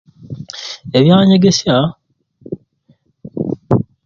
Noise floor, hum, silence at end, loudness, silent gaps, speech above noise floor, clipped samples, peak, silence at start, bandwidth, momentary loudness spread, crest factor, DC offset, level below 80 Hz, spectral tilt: -55 dBFS; none; 0.25 s; -13 LUFS; none; 45 dB; under 0.1%; 0 dBFS; 0.3 s; 7.4 kHz; 21 LU; 16 dB; under 0.1%; -48 dBFS; -6 dB/octave